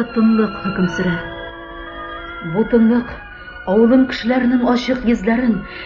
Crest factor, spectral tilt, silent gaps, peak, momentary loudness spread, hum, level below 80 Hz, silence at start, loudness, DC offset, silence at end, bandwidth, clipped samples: 14 dB; -7 dB/octave; none; -2 dBFS; 17 LU; none; -40 dBFS; 0 s; -16 LUFS; under 0.1%; 0 s; 7 kHz; under 0.1%